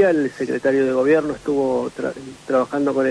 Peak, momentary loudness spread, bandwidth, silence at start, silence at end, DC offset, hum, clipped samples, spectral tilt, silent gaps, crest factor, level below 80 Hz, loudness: -6 dBFS; 9 LU; 11 kHz; 0 s; 0 s; under 0.1%; none; under 0.1%; -6.5 dB/octave; none; 14 dB; -56 dBFS; -20 LUFS